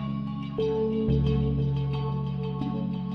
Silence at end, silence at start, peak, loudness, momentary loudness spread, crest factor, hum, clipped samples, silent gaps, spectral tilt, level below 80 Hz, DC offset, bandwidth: 0 s; 0 s; -14 dBFS; -28 LUFS; 6 LU; 14 dB; none; under 0.1%; none; -10 dB/octave; -38 dBFS; under 0.1%; 5.2 kHz